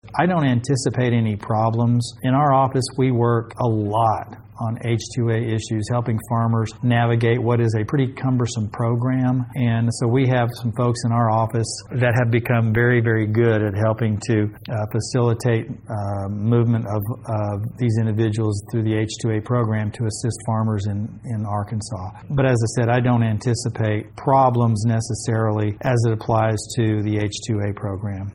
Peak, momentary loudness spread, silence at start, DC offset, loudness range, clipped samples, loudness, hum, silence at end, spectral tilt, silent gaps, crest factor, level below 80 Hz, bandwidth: -4 dBFS; 8 LU; 0.05 s; under 0.1%; 3 LU; under 0.1%; -21 LUFS; none; 0 s; -7 dB/octave; none; 16 dB; -50 dBFS; 14.5 kHz